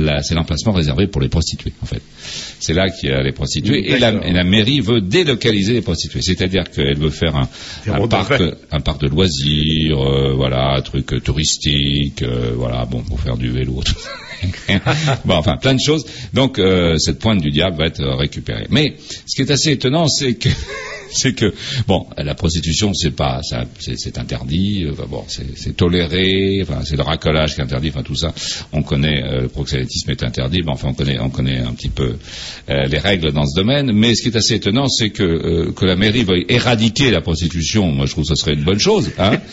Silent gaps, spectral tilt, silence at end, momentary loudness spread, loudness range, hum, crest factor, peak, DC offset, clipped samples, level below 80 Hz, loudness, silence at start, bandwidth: none; -5 dB/octave; 0 s; 9 LU; 4 LU; none; 16 dB; -2 dBFS; under 0.1%; under 0.1%; -30 dBFS; -17 LUFS; 0 s; 8 kHz